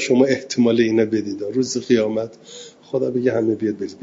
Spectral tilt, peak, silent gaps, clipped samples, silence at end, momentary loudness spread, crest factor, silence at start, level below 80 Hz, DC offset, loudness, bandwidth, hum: -5.5 dB/octave; -2 dBFS; none; under 0.1%; 0.05 s; 12 LU; 18 dB; 0 s; -62 dBFS; under 0.1%; -20 LUFS; 7.8 kHz; none